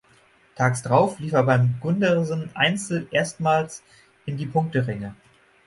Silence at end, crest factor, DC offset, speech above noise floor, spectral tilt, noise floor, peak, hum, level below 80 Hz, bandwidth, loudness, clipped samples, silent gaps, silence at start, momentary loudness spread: 0.55 s; 20 dB; under 0.1%; 35 dB; -5.5 dB/octave; -57 dBFS; -4 dBFS; none; -58 dBFS; 11.5 kHz; -23 LUFS; under 0.1%; none; 0.55 s; 13 LU